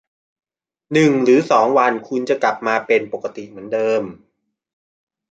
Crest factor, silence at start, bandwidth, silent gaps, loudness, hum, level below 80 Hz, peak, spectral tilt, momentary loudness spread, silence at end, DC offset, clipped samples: 18 dB; 0.9 s; 9 kHz; none; -17 LUFS; none; -66 dBFS; -2 dBFS; -6 dB/octave; 14 LU; 1.2 s; under 0.1%; under 0.1%